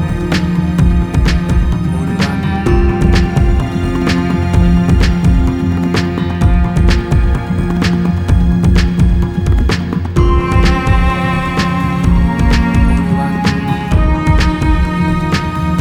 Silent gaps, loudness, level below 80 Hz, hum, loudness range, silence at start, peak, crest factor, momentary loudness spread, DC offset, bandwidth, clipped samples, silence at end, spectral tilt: none; -13 LUFS; -16 dBFS; none; 1 LU; 0 s; 0 dBFS; 12 dB; 4 LU; under 0.1%; 12 kHz; under 0.1%; 0 s; -7 dB/octave